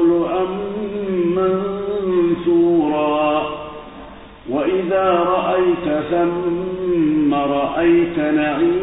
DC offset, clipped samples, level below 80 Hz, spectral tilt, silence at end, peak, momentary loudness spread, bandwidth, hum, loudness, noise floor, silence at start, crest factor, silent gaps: under 0.1%; under 0.1%; -46 dBFS; -11.5 dB/octave; 0 s; -4 dBFS; 9 LU; 4 kHz; none; -18 LUFS; -37 dBFS; 0 s; 14 dB; none